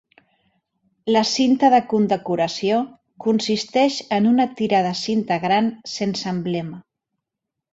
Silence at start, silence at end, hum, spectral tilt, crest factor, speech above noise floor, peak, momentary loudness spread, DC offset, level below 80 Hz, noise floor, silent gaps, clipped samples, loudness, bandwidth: 1.05 s; 0.9 s; none; -5 dB/octave; 18 dB; 64 dB; -4 dBFS; 10 LU; under 0.1%; -64 dBFS; -83 dBFS; none; under 0.1%; -20 LUFS; 8 kHz